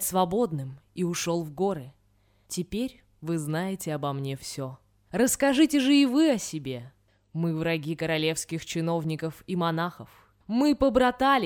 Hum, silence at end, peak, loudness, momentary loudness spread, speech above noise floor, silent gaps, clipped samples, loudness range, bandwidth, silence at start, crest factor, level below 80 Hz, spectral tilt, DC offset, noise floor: none; 0 s; -8 dBFS; -27 LUFS; 14 LU; 39 dB; none; under 0.1%; 7 LU; 19.5 kHz; 0 s; 18 dB; -54 dBFS; -5 dB/octave; under 0.1%; -65 dBFS